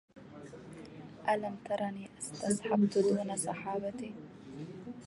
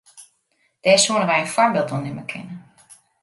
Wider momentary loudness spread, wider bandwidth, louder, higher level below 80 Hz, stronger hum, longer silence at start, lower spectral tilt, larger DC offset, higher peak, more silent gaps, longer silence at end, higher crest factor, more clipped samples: about the same, 20 LU vs 19 LU; about the same, 11.5 kHz vs 11.5 kHz; second, -34 LUFS vs -18 LUFS; about the same, -70 dBFS vs -66 dBFS; neither; about the same, 0.15 s vs 0.15 s; first, -5.5 dB/octave vs -3 dB/octave; neither; second, -16 dBFS vs -2 dBFS; neither; second, 0 s vs 0.6 s; about the same, 18 dB vs 20 dB; neither